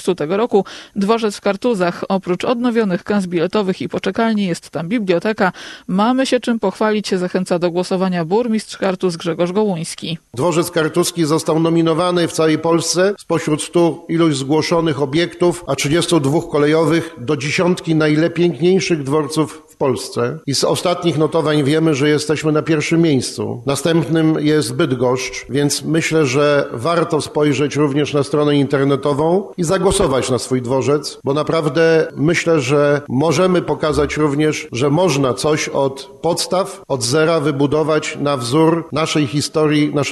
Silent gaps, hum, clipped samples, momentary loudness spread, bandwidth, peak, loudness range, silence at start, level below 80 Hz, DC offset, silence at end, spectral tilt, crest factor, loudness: none; none; under 0.1%; 5 LU; 13 kHz; -2 dBFS; 2 LU; 0 s; -46 dBFS; under 0.1%; 0 s; -5.5 dB/octave; 14 dB; -16 LUFS